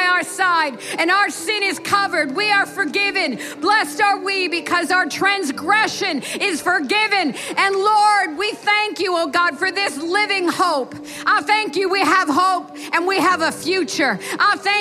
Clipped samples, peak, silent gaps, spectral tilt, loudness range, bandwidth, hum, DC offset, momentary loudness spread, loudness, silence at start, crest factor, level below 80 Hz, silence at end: under 0.1%; -2 dBFS; none; -2 dB/octave; 1 LU; 15.5 kHz; none; under 0.1%; 5 LU; -18 LUFS; 0 s; 18 dB; -68 dBFS; 0 s